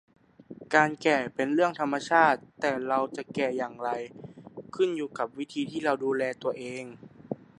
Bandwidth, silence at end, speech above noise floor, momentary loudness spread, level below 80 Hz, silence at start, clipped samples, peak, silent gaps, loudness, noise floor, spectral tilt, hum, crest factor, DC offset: 11 kHz; 0.15 s; 21 dB; 18 LU; -72 dBFS; 0.5 s; under 0.1%; -6 dBFS; none; -28 LUFS; -48 dBFS; -5 dB/octave; none; 24 dB; under 0.1%